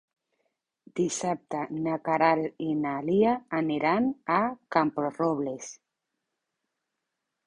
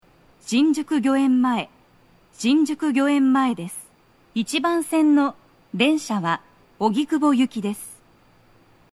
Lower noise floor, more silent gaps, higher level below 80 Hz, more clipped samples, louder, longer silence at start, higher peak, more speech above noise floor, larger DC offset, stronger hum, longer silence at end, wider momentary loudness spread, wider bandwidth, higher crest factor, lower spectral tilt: first, -84 dBFS vs -56 dBFS; neither; about the same, -68 dBFS vs -64 dBFS; neither; second, -27 LUFS vs -21 LUFS; first, 0.95 s vs 0.45 s; second, -8 dBFS vs -4 dBFS; first, 57 dB vs 36 dB; neither; neither; first, 1.7 s vs 1 s; second, 8 LU vs 13 LU; second, 11 kHz vs 13.5 kHz; about the same, 20 dB vs 18 dB; about the same, -5.5 dB/octave vs -4.5 dB/octave